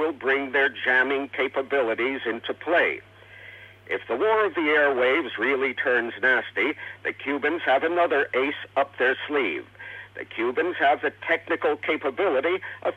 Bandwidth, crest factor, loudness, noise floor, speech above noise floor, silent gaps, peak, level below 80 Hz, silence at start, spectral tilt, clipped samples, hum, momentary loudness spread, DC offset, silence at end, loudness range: 7.6 kHz; 16 dB; -24 LUFS; -46 dBFS; 21 dB; none; -8 dBFS; -70 dBFS; 0 s; -5.5 dB/octave; under 0.1%; none; 10 LU; under 0.1%; 0 s; 3 LU